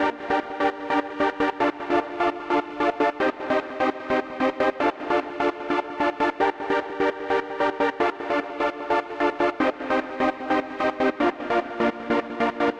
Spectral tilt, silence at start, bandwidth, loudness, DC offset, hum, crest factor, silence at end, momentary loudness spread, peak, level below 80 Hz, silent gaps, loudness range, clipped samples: -5.5 dB/octave; 0 s; 9.4 kHz; -25 LUFS; under 0.1%; none; 14 dB; 0 s; 3 LU; -10 dBFS; -56 dBFS; none; 1 LU; under 0.1%